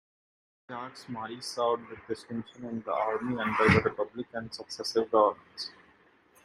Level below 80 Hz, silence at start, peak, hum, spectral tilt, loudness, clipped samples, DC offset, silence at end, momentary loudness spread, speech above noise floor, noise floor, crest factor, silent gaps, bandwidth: -62 dBFS; 0.7 s; -8 dBFS; none; -5.5 dB/octave; -30 LUFS; under 0.1%; under 0.1%; 0.75 s; 16 LU; 32 dB; -62 dBFS; 24 dB; none; 15 kHz